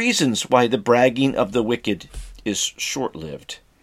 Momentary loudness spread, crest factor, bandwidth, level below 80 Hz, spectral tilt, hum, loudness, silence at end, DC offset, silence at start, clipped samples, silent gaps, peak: 17 LU; 20 dB; 15.5 kHz; -46 dBFS; -3.5 dB/octave; none; -20 LUFS; 0.25 s; under 0.1%; 0 s; under 0.1%; none; -2 dBFS